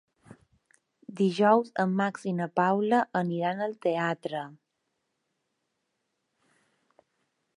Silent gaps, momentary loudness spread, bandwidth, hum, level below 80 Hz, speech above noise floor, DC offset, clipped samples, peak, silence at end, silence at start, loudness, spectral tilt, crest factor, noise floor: none; 12 LU; 11 kHz; none; -80 dBFS; 53 dB; under 0.1%; under 0.1%; -8 dBFS; 3.05 s; 0.3 s; -27 LUFS; -7 dB/octave; 22 dB; -80 dBFS